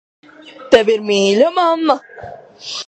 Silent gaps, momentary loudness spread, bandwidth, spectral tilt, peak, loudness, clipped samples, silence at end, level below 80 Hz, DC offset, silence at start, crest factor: none; 22 LU; 8.8 kHz; -4 dB/octave; 0 dBFS; -14 LUFS; under 0.1%; 0.05 s; -56 dBFS; under 0.1%; 0.45 s; 16 dB